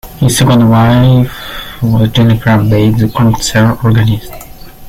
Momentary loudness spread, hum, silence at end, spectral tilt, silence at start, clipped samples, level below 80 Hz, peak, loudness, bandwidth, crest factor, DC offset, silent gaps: 10 LU; none; 0 s; -6 dB/octave; 0.05 s; under 0.1%; -30 dBFS; 0 dBFS; -9 LUFS; 16 kHz; 8 dB; under 0.1%; none